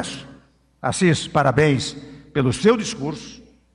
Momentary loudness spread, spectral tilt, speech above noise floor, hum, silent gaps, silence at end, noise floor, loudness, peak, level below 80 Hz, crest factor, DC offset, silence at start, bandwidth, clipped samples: 18 LU; -5.5 dB/octave; 33 dB; none; none; 0.35 s; -52 dBFS; -20 LUFS; -6 dBFS; -50 dBFS; 16 dB; under 0.1%; 0 s; 11 kHz; under 0.1%